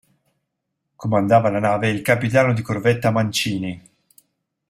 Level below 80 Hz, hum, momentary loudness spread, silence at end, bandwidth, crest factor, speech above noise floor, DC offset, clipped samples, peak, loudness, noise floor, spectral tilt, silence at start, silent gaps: -56 dBFS; none; 11 LU; 0.9 s; 16 kHz; 20 dB; 59 dB; under 0.1%; under 0.1%; 0 dBFS; -19 LUFS; -77 dBFS; -5.5 dB/octave; 1 s; none